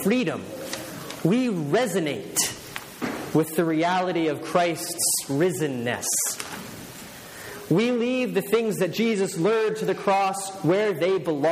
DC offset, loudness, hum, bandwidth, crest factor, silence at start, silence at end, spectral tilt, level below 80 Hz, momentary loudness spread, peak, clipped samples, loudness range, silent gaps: under 0.1%; -24 LUFS; none; 15.5 kHz; 18 dB; 0 s; 0 s; -4 dB/octave; -64 dBFS; 13 LU; -8 dBFS; under 0.1%; 2 LU; none